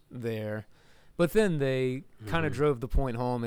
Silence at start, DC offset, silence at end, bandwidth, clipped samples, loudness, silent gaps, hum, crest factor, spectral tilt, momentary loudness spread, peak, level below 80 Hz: 0.1 s; under 0.1%; 0 s; 19.5 kHz; under 0.1%; -30 LUFS; none; none; 14 dB; -7 dB/octave; 12 LU; -14 dBFS; -40 dBFS